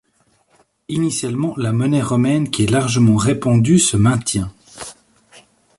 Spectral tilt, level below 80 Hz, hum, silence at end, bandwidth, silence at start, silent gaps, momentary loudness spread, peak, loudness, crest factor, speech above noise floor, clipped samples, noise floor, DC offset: -5.5 dB/octave; -44 dBFS; none; 0.85 s; 11.5 kHz; 0.9 s; none; 16 LU; -2 dBFS; -16 LUFS; 14 dB; 45 dB; under 0.1%; -60 dBFS; under 0.1%